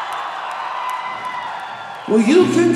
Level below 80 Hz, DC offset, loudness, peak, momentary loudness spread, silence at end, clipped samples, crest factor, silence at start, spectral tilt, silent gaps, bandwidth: -66 dBFS; under 0.1%; -19 LUFS; -2 dBFS; 15 LU; 0 s; under 0.1%; 16 dB; 0 s; -5.5 dB/octave; none; 12.5 kHz